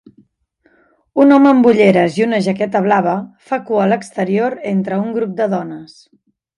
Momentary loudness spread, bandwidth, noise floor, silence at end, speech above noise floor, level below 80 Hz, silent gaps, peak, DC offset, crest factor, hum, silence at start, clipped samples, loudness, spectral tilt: 13 LU; 11 kHz; -59 dBFS; 0.7 s; 45 dB; -62 dBFS; none; 0 dBFS; under 0.1%; 14 dB; none; 1.15 s; under 0.1%; -14 LUFS; -7.5 dB/octave